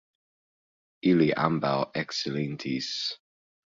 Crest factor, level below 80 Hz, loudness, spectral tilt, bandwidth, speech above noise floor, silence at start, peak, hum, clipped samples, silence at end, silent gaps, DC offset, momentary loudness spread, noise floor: 22 dB; -66 dBFS; -27 LUFS; -5.5 dB/octave; 7.6 kHz; over 63 dB; 1.05 s; -6 dBFS; none; under 0.1%; 0.65 s; none; under 0.1%; 9 LU; under -90 dBFS